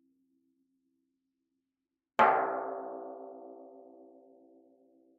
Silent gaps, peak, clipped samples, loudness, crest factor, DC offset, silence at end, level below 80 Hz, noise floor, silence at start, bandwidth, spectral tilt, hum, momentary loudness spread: none; -10 dBFS; under 0.1%; -30 LUFS; 26 dB; under 0.1%; 1.15 s; -88 dBFS; -89 dBFS; 2.2 s; 5 kHz; -2 dB/octave; none; 25 LU